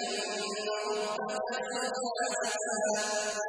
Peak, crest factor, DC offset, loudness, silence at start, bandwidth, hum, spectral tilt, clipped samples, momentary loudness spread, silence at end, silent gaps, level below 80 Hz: -18 dBFS; 14 dB; under 0.1%; -32 LUFS; 0 s; 10.5 kHz; none; -1 dB/octave; under 0.1%; 4 LU; 0 s; none; -80 dBFS